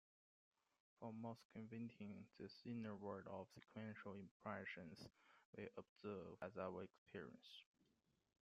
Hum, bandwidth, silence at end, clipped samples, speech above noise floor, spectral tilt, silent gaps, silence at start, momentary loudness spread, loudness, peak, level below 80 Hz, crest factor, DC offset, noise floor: none; 8 kHz; 0.8 s; under 0.1%; 30 dB; -5.5 dB/octave; 1.45-1.50 s, 4.31-4.40 s, 5.45-5.53 s, 5.89-5.96 s, 6.98-7.06 s; 1 s; 8 LU; -56 LUFS; -34 dBFS; -88 dBFS; 22 dB; under 0.1%; -85 dBFS